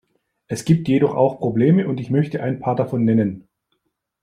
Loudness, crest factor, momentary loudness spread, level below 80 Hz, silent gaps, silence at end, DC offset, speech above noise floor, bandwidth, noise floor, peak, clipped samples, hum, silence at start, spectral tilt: -19 LUFS; 16 dB; 8 LU; -58 dBFS; none; 0.8 s; under 0.1%; 54 dB; 13 kHz; -72 dBFS; -4 dBFS; under 0.1%; none; 0.5 s; -8 dB/octave